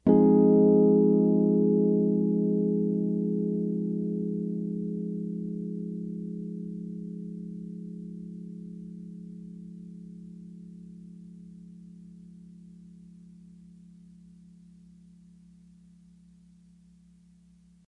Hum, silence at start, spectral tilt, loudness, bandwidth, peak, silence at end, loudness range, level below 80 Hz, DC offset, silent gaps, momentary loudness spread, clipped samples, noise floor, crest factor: 60 Hz at -70 dBFS; 0.05 s; -12.5 dB/octave; -26 LUFS; 2.1 kHz; -8 dBFS; 5 s; 26 LU; -66 dBFS; under 0.1%; none; 27 LU; under 0.1%; -58 dBFS; 20 dB